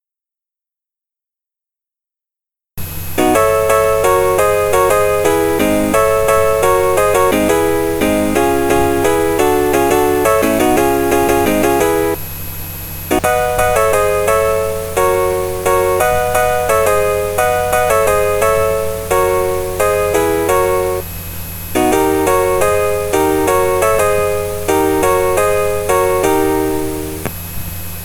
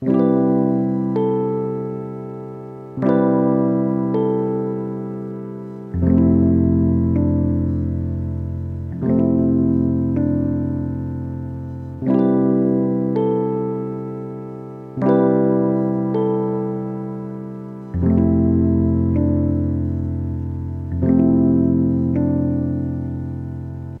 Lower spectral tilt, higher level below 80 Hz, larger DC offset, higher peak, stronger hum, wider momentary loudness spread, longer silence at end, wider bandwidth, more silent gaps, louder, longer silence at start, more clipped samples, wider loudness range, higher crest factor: second, -4.5 dB/octave vs -12.5 dB/octave; about the same, -34 dBFS vs -38 dBFS; neither; first, 0 dBFS vs -4 dBFS; neither; second, 8 LU vs 14 LU; about the same, 0 s vs 0 s; first, over 20 kHz vs 3.7 kHz; neither; first, -14 LUFS vs -19 LUFS; first, 2.75 s vs 0 s; neither; about the same, 3 LU vs 2 LU; about the same, 14 dB vs 16 dB